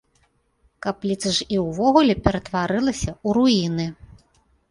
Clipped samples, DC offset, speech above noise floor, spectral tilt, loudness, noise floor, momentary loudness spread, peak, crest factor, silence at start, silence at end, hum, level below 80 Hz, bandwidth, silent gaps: under 0.1%; under 0.1%; 44 dB; -5 dB/octave; -21 LUFS; -64 dBFS; 11 LU; -2 dBFS; 20 dB; 0.85 s; 0.8 s; none; -42 dBFS; 11.5 kHz; none